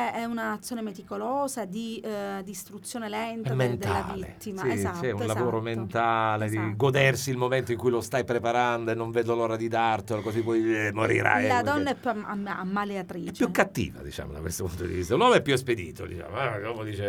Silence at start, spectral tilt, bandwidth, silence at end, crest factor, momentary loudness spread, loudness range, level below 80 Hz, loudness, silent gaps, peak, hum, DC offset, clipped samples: 0 s; -5.5 dB/octave; 20 kHz; 0 s; 22 dB; 12 LU; 5 LU; -56 dBFS; -27 LUFS; none; -4 dBFS; none; under 0.1%; under 0.1%